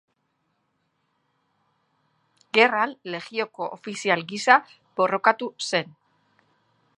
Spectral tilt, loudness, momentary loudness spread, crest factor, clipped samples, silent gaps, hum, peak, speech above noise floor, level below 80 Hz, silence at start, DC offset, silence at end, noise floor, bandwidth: -3 dB/octave; -23 LUFS; 13 LU; 26 dB; under 0.1%; none; none; -2 dBFS; 50 dB; -82 dBFS; 2.55 s; under 0.1%; 1.1 s; -73 dBFS; 11 kHz